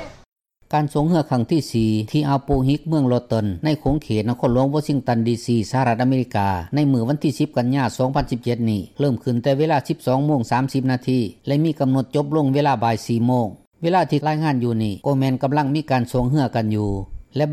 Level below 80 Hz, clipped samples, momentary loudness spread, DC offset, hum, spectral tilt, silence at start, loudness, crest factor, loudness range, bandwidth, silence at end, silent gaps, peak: -42 dBFS; under 0.1%; 4 LU; under 0.1%; none; -7.5 dB/octave; 0 s; -20 LUFS; 12 dB; 1 LU; 14 kHz; 0 s; 0.28-0.32 s, 13.67-13.71 s; -6 dBFS